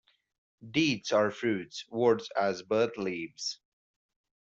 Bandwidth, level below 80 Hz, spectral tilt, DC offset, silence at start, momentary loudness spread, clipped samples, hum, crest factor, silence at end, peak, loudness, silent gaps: 8 kHz; -70 dBFS; -4.5 dB/octave; under 0.1%; 0.6 s; 9 LU; under 0.1%; none; 18 dB; 0.85 s; -14 dBFS; -30 LUFS; none